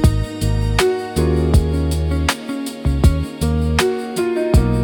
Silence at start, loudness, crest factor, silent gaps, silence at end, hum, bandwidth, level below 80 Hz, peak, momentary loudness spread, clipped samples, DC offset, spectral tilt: 0 s; -18 LUFS; 16 dB; none; 0 s; none; 18 kHz; -22 dBFS; 0 dBFS; 5 LU; under 0.1%; under 0.1%; -6 dB/octave